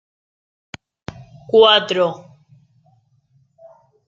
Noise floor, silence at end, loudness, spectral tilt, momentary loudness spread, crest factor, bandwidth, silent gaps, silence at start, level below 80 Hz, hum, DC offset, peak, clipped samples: -59 dBFS; 1.9 s; -14 LUFS; -4 dB/octave; 29 LU; 20 dB; 7.4 kHz; none; 1.2 s; -60 dBFS; none; under 0.1%; 0 dBFS; under 0.1%